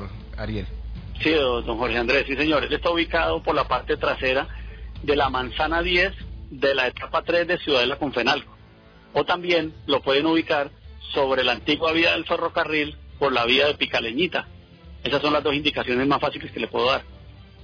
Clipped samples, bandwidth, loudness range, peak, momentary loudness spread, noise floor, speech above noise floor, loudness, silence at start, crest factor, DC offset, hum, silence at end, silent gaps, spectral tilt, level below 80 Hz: under 0.1%; 5.4 kHz; 2 LU; -8 dBFS; 11 LU; -49 dBFS; 27 dB; -22 LUFS; 0 s; 16 dB; under 0.1%; none; 0 s; none; -5.5 dB/octave; -40 dBFS